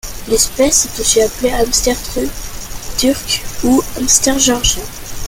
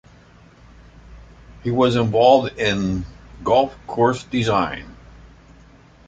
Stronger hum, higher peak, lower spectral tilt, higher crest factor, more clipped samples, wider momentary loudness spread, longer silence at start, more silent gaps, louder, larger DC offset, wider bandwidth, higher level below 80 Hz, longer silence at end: neither; about the same, 0 dBFS vs -2 dBFS; second, -2 dB/octave vs -6 dB/octave; second, 14 dB vs 20 dB; neither; second, 11 LU vs 14 LU; second, 0.05 s vs 1.05 s; neither; first, -13 LUFS vs -19 LUFS; neither; first, 17 kHz vs 9.2 kHz; first, -28 dBFS vs -44 dBFS; second, 0 s vs 1.15 s